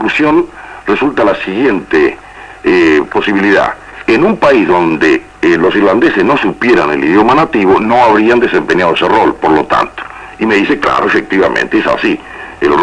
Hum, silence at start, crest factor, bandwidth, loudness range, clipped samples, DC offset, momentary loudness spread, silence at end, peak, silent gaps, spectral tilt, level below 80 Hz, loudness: none; 0 s; 10 dB; 10 kHz; 3 LU; under 0.1%; under 0.1%; 8 LU; 0 s; 0 dBFS; none; -6 dB/octave; -40 dBFS; -10 LUFS